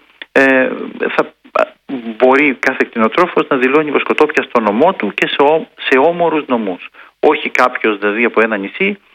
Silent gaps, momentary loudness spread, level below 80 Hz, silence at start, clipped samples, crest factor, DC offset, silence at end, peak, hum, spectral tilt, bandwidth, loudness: none; 7 LU; -60 dBFS; 0.35 s; 0.2%; 14 dB; under 0.1%; 0.2 s; 0 dBFS; none; -5.5 dB/octave; 11 kHz; -13 LUFS